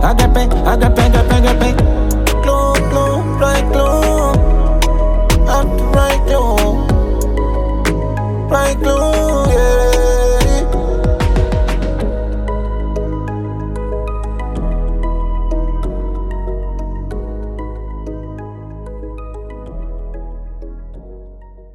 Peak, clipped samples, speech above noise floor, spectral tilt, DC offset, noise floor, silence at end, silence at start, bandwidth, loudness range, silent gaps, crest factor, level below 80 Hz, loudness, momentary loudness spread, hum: 0 dBFS; under 0.1%; 25 dB; -6 dB/octave; under 0.1%; -35 dBFS; 0 s; 0 s; 15.5 kHz; 14 LU; none; 12 dB; -16 dBFS; -15 LUFS; 17 LU; none